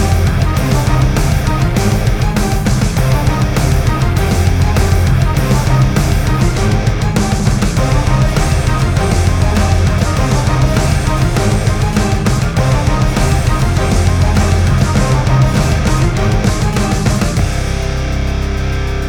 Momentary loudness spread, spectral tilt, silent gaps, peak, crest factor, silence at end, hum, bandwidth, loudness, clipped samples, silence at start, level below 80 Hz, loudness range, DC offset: 2 LU; -6 dB/octave; none; 0 dBFS; 12 dB; 0 s; none; 18 kHz; -13 LUFS; under 0.1%; 0 s; -18 dBFS; 1 LU; under 0.1%